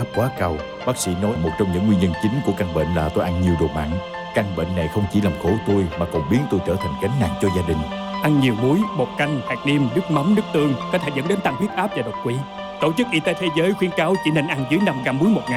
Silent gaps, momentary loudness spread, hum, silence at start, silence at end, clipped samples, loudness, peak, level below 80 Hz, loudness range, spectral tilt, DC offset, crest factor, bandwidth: none; 6 LU; none; 0 s; 0 s; under 0.1%; -21 LUFS; -8 dBFS; -44 dBFS; 2 LU; -6.5 dB/octave; under 0.1%; 12 dB; 16 kHz